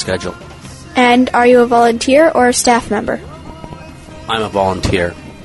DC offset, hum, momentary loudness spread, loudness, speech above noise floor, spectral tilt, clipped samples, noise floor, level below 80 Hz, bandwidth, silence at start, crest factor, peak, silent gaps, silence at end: under 0.1%; none; 23 LU; -12 LUFS; 21 dB; -4 dB/octave; under 0.1%; -33 dBFS; -38 dBFS; 12 kHz; 0 s; 14 dB; 0 dBFS; none; 0 s